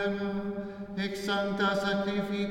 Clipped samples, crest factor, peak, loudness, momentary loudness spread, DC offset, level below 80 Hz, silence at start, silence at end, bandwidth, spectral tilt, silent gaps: under 0.1%; 14 dB; -16 dBFS; -31 LUFS; 9 LU; under 0.1%; -56 dBFS; 0 s; 0 s; 16 kHz; -5.5 dB/octave; none